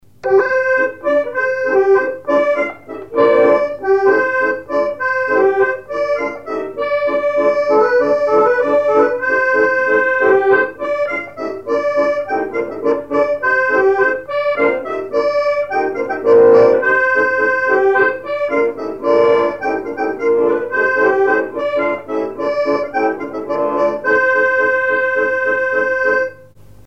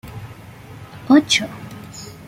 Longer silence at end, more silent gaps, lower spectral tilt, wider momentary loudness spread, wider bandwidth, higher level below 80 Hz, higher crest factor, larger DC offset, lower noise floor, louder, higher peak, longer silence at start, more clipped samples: first, 0.55 s vs 0.15 s; neither; first, -5.5 dB/octave vs -3.5 dB/octave; second, 8 LU vs 25 LU; second, 8 kHz vs 16 kHz; about the same, -56 dBFS vs -52 dBFS; about the same, 14 dB vs 18 dB; first, 0.5% vs under 0.1%; about the same, -42 dBFS vs -39 dBFS; about the same, -15 LUFS vs -15 LUFS; about the same, 0 dBFS vs -2 dBFS; first, 0.25 s vs 0.05 s; neither